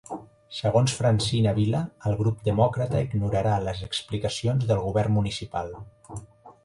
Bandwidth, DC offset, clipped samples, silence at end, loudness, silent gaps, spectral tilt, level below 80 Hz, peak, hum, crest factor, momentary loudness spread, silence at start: 11.5 kHz; under 0.1%; under 0.1%; 0.15 s; -25 LUFS; none; -6 dB/octave; -46 dBFS; -8 dBFS; none; 18 dB; 17 LU; 0.1 s